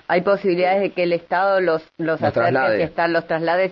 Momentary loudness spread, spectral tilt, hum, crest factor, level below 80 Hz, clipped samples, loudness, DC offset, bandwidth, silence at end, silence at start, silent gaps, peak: 4 LU; -8.5 dB/octave; none; 16 dB; -58 dBFS; under 0.1%; -19 LUFS; under 0.1%; 5.8 kHz; 0 s; 0.1 s; none; -4 dBFS